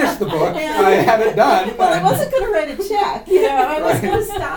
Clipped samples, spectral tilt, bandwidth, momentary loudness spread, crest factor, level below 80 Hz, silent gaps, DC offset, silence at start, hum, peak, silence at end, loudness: under 0.1%; -5 dB/octave; 19 kHz; 6 LU; 14 dB; -40 dBFS; none; under 0.1%; 0 s; none; 0 dBFS; 0 s; -16 LUFS